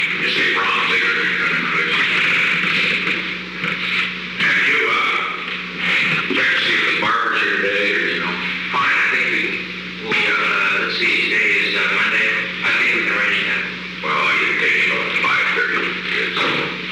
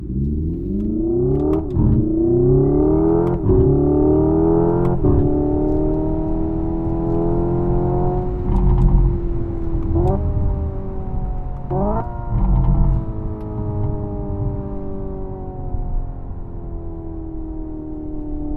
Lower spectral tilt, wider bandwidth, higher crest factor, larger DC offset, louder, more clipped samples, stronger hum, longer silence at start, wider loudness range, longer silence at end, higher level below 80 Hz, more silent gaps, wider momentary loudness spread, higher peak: second, -3 dB/octave vs -13 dB/octave; first, 15 kHz vs 2.7 kHz; about the same, 12 dB vs 16 dB; neither; first, -16 LUFS vs -20 LUFS; neither; neither; about the same, 0 s vs 0 s; second, 2 LU vs 12 LU; about the same, 0 s vs 0 s; second, -54 dBFS vs -24 dBFS; neither; second, 6 LU vs 15 LU; second, -8 dBFS vs -2 dBFS